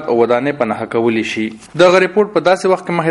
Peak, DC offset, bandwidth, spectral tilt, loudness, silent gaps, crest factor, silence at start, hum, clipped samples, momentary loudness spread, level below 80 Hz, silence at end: 0 dBFS; under 0.1%; 11.5 kHz; -5.5 dB/octave; -14 LUFS; none; 14 dB; 0 s; none; under 0.1%; 9 LU; -56 dBFS; 0 s